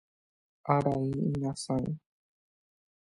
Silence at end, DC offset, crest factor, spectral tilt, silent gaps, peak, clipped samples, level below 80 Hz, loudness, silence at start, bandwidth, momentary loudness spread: 1.15 s; under 0.1%; 24 dB; -7 dB/octave; none; -10 dBFS; under 0.1%; -60 dBFS; -31 LUFS; 0.65 s; 11.5 kHz; 12 LU